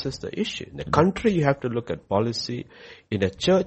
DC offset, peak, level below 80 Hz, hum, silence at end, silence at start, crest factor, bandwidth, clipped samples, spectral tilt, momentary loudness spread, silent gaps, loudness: under 0.1%; -2 dBFS; -50 dBFS; none; 0 s; 0 s; 22 dB; 8.4 kHz; under 0.1%; -6 dB/octave; 11 LU; none; -25 LUFS